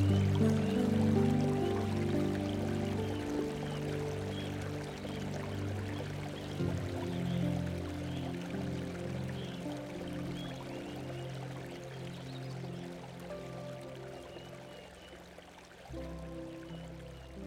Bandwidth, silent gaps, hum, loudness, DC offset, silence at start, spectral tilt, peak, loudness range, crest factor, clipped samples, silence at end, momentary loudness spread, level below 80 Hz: 16 kHz; none; none; -37 LUFS; under 0.1%; 0 s; -7 dB/octave; -16 dBFS; 14 LU; 20 dB; under 0.1%; 0 s; 18 LU; -56 dBFS